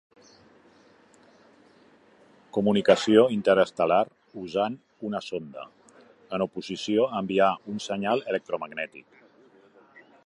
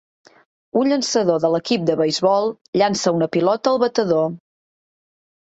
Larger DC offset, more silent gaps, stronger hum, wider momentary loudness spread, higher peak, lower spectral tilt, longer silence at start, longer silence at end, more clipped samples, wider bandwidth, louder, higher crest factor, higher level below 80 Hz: neither; second, none vs 2.61-2.73 s; neither; first, 16 LU vs 3 LU; about the same, -4 dBFS vs -4 dBFS; about the same, -5.5 dB/octave vs -5 dB/octave; first, 2.55 s vs 0.75 s; about the same, 1.25 s vs 1.15 s; neither; first, 11 kHz vs 8.2 kHz; second, -26 LUFS vs -19 LUFS; first, 24 dB vs 16 dB; about the same, -68 dBFS vs -64 dBFS